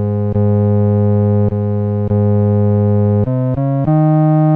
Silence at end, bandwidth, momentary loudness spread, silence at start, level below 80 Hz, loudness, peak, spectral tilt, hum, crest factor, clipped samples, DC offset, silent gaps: 0 s; 2.8 kHz; 5 LU; 0 s; -40 dBFS; -14 LUFS; -4 dBFS; -13.5 dB/octave; none; 8 dB; under 0.1%; under 0.1%; none